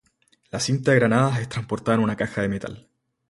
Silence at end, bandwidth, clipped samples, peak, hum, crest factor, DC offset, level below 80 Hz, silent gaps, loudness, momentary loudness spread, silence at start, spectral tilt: 0.5 s; 11.5 kHz; under 0.1%; -4 dBFS; none; 20 dB; under 0.1%; -54 dBFS; none; -23 LUFS; 12 LU; 0.55 s; -6 dB/octave